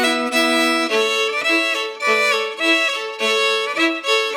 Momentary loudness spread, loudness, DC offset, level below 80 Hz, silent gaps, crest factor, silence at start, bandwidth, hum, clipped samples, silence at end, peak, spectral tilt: 3 LU; -17 LUFS; under 0.1%; under -90 dBFS; none; 14 dB; 0 s; 19.5 kHz; none; under 0.1%; 0 s; -4 dBFS; -0.5 dB/octave